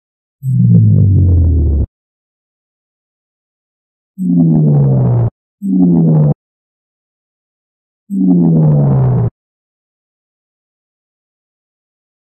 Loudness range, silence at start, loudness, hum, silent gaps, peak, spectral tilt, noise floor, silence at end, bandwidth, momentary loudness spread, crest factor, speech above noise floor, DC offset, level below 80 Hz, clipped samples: 5 LU; 0.45 s; -11 LUFS; none; 1.88-4.14 s, 5.31-5.58 s, 6.35-8.07 s; 0 dBFS; -14 dB/octave; under -90 dBFS; 3 s; 1.9 kHz; 11 LU; 14 dB; over 81 dB; under 0.1%; -28 dBFS; under 0.1%